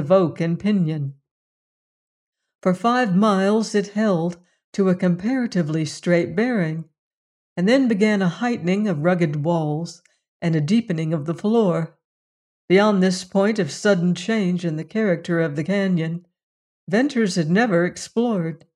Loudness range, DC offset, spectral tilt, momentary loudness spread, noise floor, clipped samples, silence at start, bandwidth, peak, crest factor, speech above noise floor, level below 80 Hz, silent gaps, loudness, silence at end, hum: 2 LU; under 0.1%; -6.5 dB/octave; 8 LU; under -90 dBFS; under 0.1%; 0 s; 11 kHz; -4 dBFS; 16 dB; over 70 dB; -66 dBFS; 1.31-2.32 s, 2.55-2.59 s, 4.64-4.73 s, 6.98-7.56 s, 10.28-10.40 s, 12.05-12.68 s, 16.43-16.87 s; -21 LUFS; 0.2 s; none